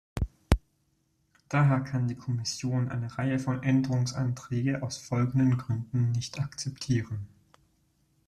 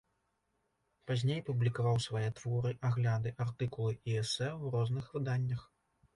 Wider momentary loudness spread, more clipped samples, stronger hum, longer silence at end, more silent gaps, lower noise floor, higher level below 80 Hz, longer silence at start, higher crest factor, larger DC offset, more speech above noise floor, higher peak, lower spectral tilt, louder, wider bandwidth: first, 9 LU vs 5 LU; neither; neither; first, 1 s vs 0.5 s; neither; second, -72 dBFS vs -80 dBFS; first, -44 dBFS vs -64 dBFS; second, 0.15 s vs 1.05 s; first, 26 dB vs 14 dB; neither; about the same, 44 dB vs 46 dB; first, -2 dBFS vs -20 dBFS; about the same, -6.5 dB/octave vs -6 dB/octave; first, -30 LUFS vs -35 LUFS; about the same, 12 kHz vs 11.5 kHz